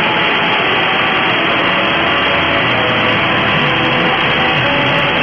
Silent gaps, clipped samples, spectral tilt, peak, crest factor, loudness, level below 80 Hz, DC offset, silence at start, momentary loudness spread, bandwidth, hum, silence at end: none; under 0.1%; -6 dB/octave; -2 dBFS; 10 dB; -12 LUFS; -42 dBFS; under 0.1%; 0 s; 0 LU; 7.6 kHz; none; 0 s